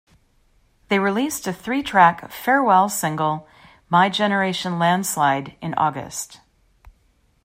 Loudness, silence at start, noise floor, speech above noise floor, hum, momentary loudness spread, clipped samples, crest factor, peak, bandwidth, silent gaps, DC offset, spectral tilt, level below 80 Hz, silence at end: -20 LUFS; 0.9 s; -61 dBFS; 41 dB; none; 12 LU; under 0.1%; 20 dB; -2 dBFS; 16 kHz; none; under 0.1%; -4 dB/octave; -58 dBFS; 0.55 s